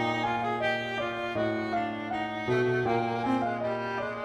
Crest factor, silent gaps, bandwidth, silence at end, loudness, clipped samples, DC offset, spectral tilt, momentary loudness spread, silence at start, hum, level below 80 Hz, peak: 14 dB; none; 11.5 kHz; 0 s; -29 LUFS; under 0.1%; under 0.1%; -6.5 dB/octave; 5 LU; 0 s; none; -62 dBFS; -16 dBFS